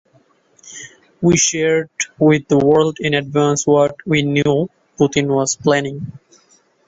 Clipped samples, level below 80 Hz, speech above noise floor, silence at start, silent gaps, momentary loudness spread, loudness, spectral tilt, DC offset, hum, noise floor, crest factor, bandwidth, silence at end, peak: under 0.1%; -52 dBFS; 40 dB; 0.65 s; none; 15 LU; -16 LUFS; -4.5 dB/octave; under 0.1%; none; -56 dBFS; 16 dB; 8.2 kHz; 0.7 s; -2 dBFS